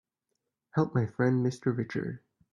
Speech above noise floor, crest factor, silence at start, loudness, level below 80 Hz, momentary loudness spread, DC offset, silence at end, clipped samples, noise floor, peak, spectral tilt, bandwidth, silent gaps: 55 dB; 18 dB; 0.75 s; -30 LUFS; -66 dBFS; 10 LU; under 0.1%; 0.35 s; under 0.1%; -84 dBFS; -12 dBFS; -8.5 dB/octave; 10.5 kHz; none